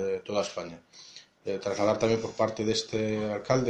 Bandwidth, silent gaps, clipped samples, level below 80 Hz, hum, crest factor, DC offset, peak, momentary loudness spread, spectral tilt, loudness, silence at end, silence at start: 10.5 kHz; none; under 0.1%; -60 dBFS; none; 20 dB; under 0.1%; -10 dBFS; 20 LU; -5 dB/octave; -29 LUFS; 0 s; 0 s